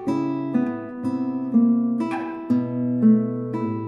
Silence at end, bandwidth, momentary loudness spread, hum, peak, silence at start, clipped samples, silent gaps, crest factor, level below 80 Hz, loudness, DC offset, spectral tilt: 0 s; 6.6 kHz; 9 LU; none; -8 dBFS; 0 s; under 0.1%; none; 14 dB; -66 dBFS; -22 LUFS; under 0.1%; -9.5 dB/octave